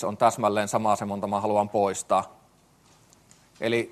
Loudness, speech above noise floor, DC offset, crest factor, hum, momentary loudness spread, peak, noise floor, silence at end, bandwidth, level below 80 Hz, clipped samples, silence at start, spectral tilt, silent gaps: -25 LUFS; 35 dB; under 0.1%; 20 dB; none; 5 LU; -8 dBFS; -59 dBFS; 0 s; 13 kHz; -68 dBFS; under 0.1%; 0 s; -4.5 dB/octave; none